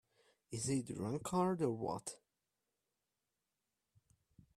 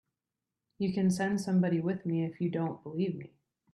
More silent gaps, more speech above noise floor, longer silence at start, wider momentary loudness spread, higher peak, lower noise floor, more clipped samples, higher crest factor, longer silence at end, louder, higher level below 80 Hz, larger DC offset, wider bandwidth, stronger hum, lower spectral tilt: neither; second, 51 dB vs 58 dB; second, 0.5 s vs 0.8 s; first, 13 LU vs 7 LU; about the same, -22 dBFS vs -20 dBFS; about the same, -90 dBFS vs -89 dBFS; neither; first, 22 dB vs 14 dB; first, 2.4 s vs 0.45 s; second, -40 LUFS vs -32 LUFS; about the same, -74 dBFS vs -70 dBFS; neither; first, 14.5 kHz vs 12 kHz; neither; second, -5.5 dB/octave vs -7.5 dB/octave